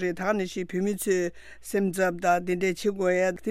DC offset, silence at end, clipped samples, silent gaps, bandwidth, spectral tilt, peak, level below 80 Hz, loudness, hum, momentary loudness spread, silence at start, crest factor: under 0.1%; 0 s; under 0.1%; none; 15.5 kHz; -5.5 dB/octave; -12 dBFS; -58 dBFS; -27 LUFS; none; 6 LU; 0 s; 16 dB